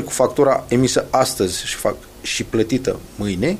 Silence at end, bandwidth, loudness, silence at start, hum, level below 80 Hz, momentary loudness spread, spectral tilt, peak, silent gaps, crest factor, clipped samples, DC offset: 0 s; 15.5 kHz; -19 LUFS; 0 s; none; -42 dBFS; 9 LU; -4.5 dB/octave; -2 dBFS; none; 18 dB; under 0.1%; under 0.1%